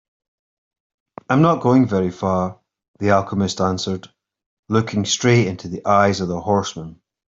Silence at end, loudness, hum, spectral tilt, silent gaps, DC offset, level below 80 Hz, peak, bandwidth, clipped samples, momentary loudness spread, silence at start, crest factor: 0.4 s; -19 LUFS; none; -5.5 dB/octave; 2.88-2.94 s, 4.46-4.63 s; under 0.1%; -56 dBFS; -2 dBFS; 7.8 kHz; under 0.1%; 11 LU; 1.3 s; 18 dB